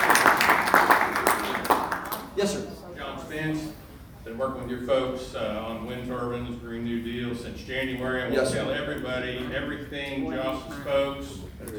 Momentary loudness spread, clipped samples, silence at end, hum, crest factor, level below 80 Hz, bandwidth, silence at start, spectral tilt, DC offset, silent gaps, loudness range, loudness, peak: 17 LU; under 0.1%; 0 s; none; 26 dB; -48 dBFS; over 20 kHz; 0 s; -4 dB/octave; under 0.1%; none; 7 LU; -27 LUFS; -2 dBFS